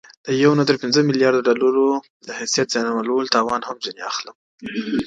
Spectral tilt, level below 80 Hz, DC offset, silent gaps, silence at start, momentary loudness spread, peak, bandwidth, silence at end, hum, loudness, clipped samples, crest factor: -4.5 dB/octave; -60 dBFS; under 0.1%; 2.10-2.20 s, 4.35-4.58 s; 0.25 s; 12 LU; 0 dBFS; 9.2 kHz; 0 s; none; -19 LUFS; under 0.1%; 20 dB